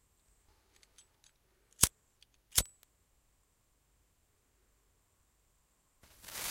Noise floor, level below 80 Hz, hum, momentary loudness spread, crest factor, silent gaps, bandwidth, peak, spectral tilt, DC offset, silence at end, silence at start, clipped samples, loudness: -74 dBFS; -56 dBFS; none; 16 LU; 38 dB; none; 16 kHz; -6 dBFS; -1 dB/octave; under 0.1%; 0 s; 1.8 s; under 0.1%; -32 LUFS